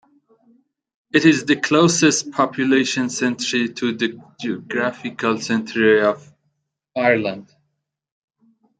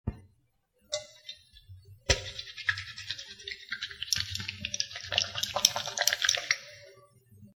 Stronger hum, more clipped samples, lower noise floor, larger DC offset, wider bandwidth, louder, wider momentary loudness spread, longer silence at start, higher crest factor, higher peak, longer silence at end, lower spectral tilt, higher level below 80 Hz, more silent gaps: neither; neither; about the same, -74 dBFS vs -72 dBFS; neither; second, 9.4 kHz vs over 20 kHz; first, -19 LUFS vs -30 LUFS; second, 12 LU vs 16 LU; first, 1.15 s vs 0.05 s; second, 18 dB vs 34 dB; about the same, -2 dBFS vs 0 dBFS; first, 1.4 s vs 0.05 s; first, -4 dB/octave vs -0.5 dB/octave; second, -66 dBFS vs -50 dBFS; neither